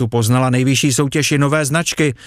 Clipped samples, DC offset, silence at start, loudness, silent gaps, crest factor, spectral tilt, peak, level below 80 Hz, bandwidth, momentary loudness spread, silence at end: under 0.1%; under 0.1%; 0 s; -15 LUFS; none; 12 dB; -4.5 dB/octave; -4 dBFS; -50 dBFS; 15.5 kHz; 2 LU; 0 s